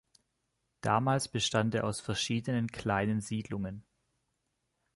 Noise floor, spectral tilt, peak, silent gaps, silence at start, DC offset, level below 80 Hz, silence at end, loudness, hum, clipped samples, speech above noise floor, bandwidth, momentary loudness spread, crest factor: -81 dBFS; -5 dB/octave; -14 dBFS; none; 0.85 s; under 0.1%; -60 dBFS; 1.15 s; -32 LUFS; none; under 0.1%; 49 dB; 12 kHz; 9 LU; 20 dB